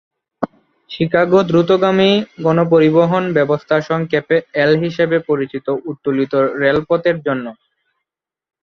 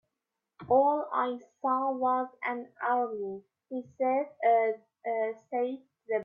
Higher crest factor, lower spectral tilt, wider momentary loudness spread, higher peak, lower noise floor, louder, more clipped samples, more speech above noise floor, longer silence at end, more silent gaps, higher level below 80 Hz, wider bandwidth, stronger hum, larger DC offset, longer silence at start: about the same, 14 dB vs 18 dB; about the same, -7.5 dB/octave vs -7.5 dB/octave; second, 10 LU vs 13 LU; first, -2 dBFS vs -14 dBFS; second, -83 dBFS vs -87 dBFS; first, -15 LUFS vs -30 LUFS; neither; first, 69 dB vs 57 dB; first, 1.1 s vs 0 s; neither; first, -54 dBFS vs -78 dBFS; about the same, 6.8 kHz vs 6.8 kHz; neither; neither; second, 0.4 s vs 0.6 s